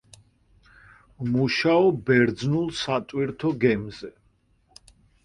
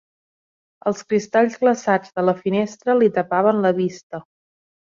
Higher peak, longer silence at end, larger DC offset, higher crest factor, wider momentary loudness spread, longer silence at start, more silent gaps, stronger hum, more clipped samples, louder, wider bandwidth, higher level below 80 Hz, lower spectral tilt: about the same, -6 dBFS vs -4 dBFS; first, 1.15 s vs 0.65 s; neither; about the same, 18 dB vs 16 dB; first, 13 LU vs 9 LU; first, 1.2 s vs 0.85 s; second, none vs 4.03-4.10 s; neither; neither; second, -23 LUFS vs -20 LUFS; first, 11.5 kHz vs 7.6 kHz; first, -56 dBFS vs -66 dBFS; about the same, -6.5 dB/octave vs -6.5 dB/octave